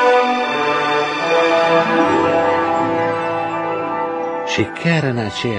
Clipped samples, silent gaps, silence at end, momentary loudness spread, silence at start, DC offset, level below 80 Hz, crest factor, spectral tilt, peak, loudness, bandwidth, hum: under 0.1%; none; 0 s; 7 LU; 0 s; under 0.1%; -56 dBFS; 14 dB; -5.5 dB/octave; -2 dBFS; -17 LUFS; 9.6 kHz; none